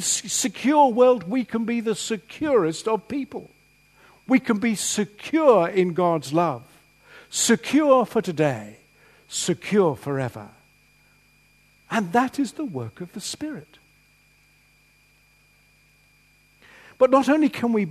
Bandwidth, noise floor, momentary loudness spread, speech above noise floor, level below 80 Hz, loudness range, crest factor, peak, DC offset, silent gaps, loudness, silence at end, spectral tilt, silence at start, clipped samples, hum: 13.5 kHz; -59 dBFS; 14 LU; 37 dB; -64 dBFS; 8 LU; 20 dB; -4 dBFS; under 0.1%; none; -22 LUFS; 0 s; -4.5 dB/octave; 0 s; under 0.1%; 50 Hz at -60 dBFS